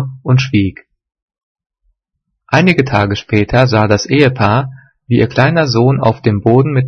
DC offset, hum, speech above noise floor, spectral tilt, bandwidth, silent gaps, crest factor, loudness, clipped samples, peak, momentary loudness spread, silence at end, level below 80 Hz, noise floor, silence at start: under 0.1%; none; 61 dB; -7 dB/octave; 6.6 kHz; 1.22-1.28 s, 1.43-1.55 s; 12 dB; -12 LUFS; 0.1%; 0 dBFS; 5 LU; 0 s; -42 dBFS; -72 dBFS; 0 s